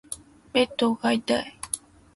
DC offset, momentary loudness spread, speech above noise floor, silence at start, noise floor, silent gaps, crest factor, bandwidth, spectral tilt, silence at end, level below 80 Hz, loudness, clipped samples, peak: under 0.1%; 12 LU; 19 dB; 0.1 s; -43 dBFS; none; 18 dB; 12 kHz; -3 dB/octave; 0.4 s; -60 dBFS; -26 LUFS; under 0.1%; -8 dBFS